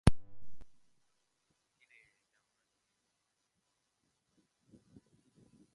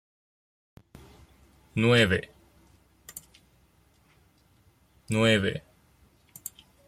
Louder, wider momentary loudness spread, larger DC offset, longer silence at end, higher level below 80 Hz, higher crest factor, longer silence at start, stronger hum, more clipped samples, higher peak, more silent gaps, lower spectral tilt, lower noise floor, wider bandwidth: second, -33 LUFS vs -25 LUFS; second, 18 LU vs 24 LU; neither; first, 5.05 s vs 1.3 s; first, -50 dBFS vs -60 dBFS; first, 30 dB vs 22 dB; second, 0.05 s vs 1.75 s; neither; neither; about the same, -8 dBFS vs -8 dBFS; neither; first, -6.5 dB/octave vs -5 dB/octave; first, -83 dBFS vs -63 dBFS; second, 11 kHz vs 16 kHz